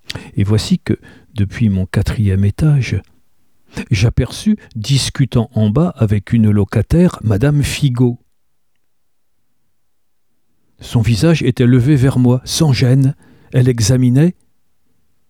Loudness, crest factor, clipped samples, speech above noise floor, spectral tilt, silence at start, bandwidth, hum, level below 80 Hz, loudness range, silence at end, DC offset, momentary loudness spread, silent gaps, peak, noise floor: -14 LUFS; 14 dB; under 0.1%; 59 dB; -6.5 dB/octave; 0.1 s; 15 kHz; none; -34 dBFS; 7 LU; 1 s; 0.2%; 9 LU; none; 0 dBFS; -72 dBFS